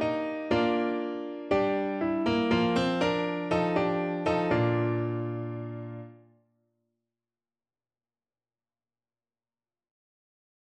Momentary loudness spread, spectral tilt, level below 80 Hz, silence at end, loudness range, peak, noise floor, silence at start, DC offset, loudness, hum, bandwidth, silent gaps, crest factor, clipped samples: 11 LU; -7 dB/octave; -58 dBFS; 4.5 s; 14 LU; -14 dBFS; under -90 dBFS; 0 s; under 0.1%; -28 LUFS; none; 9.4 kHz; none; 16 dB; under 0.1%